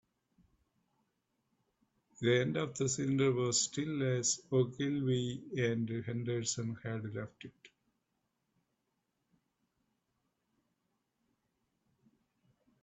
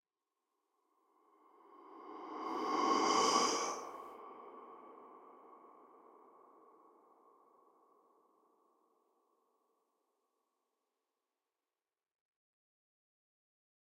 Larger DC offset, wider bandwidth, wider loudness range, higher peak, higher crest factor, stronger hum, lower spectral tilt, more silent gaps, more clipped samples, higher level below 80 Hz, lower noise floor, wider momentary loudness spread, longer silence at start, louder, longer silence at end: neither; second, 8.2 kHz vs 16 kHz; second, 11 LU vs 21 LU; about the same, -18 dBFS vs -18 dBFS; second, 20 dB vs 26 dB; neither; first, -4.5 dB/octave vs -1.5 dB/octave; neither; neither; first, -74 dBFS vs under -90 dBFS; second, -83 dBFS vs under -90 dBFS; second, 10 LU vs 27 LU; first, 2.2 s vs 1.7 s; about the same, -34 LUFS vs -35 LUFS; second, 5.15 s vs 8.35 s